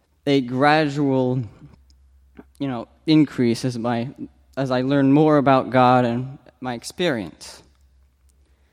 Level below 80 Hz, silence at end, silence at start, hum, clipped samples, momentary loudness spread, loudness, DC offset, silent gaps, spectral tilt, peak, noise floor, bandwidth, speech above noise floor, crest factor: -56 dBFS; 1.15 s; 0.25 s; none; under 0.1%; 18 LU; -20 LUFS; under 0.1%; none; -6.5 dB/octave; -4 dBFS; -58 dBFS; 12.5 kHz; 38 dB; 18 dB